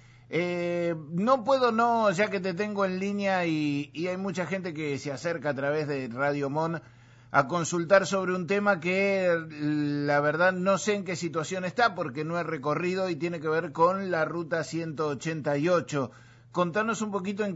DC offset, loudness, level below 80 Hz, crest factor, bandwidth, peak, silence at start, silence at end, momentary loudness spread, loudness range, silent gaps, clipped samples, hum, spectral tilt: under 0.1%; -28 LUFS; -68 dBFS; 22 dB; 8 kHz; -6 dBFS; 0.3 s; 0 s; 8 LU; 4 LU; none; under 0.1%; none; -5.5 dB/octave